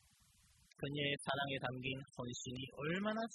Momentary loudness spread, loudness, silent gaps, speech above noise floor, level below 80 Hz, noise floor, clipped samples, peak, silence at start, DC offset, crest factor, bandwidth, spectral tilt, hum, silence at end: 8 LU; -42 LUFS; none; 29 dB; -72 dBFS; -71 dBFS; under 0.1%; -24 dBFS; 0.8 s; under 0.1%; 20 dB; 12 kHz; -4.5 dB/octave; none; 0 s